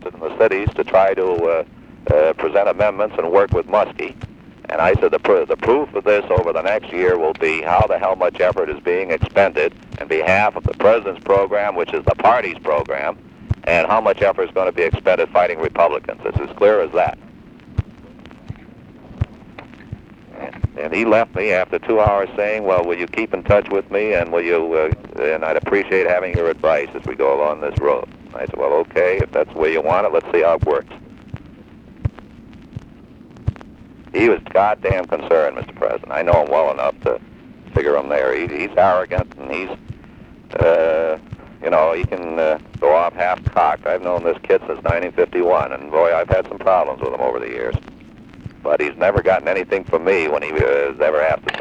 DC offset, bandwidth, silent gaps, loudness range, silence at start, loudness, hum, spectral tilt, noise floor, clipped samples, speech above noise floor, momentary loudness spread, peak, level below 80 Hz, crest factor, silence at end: under 0.1%; 8.2 kHz; none; 4 LU; 0 s; -18 LUFS; none; -7.5 dB/octave; -42 dBFS; under 0.1%; 25 dB; 13 LU; 0 dBFS; -38 dBFS; 18 dB; 0 s